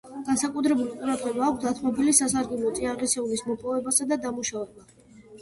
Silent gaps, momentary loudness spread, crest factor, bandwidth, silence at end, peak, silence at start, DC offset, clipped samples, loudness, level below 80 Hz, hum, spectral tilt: none; 9 LU; 22 dB; 12 kHz; 0 s; -4 dBFS; 0.05 s; under 0.1%; under 0.1%; -25 LUFS; -58 dBFS; none; -3 dB/octave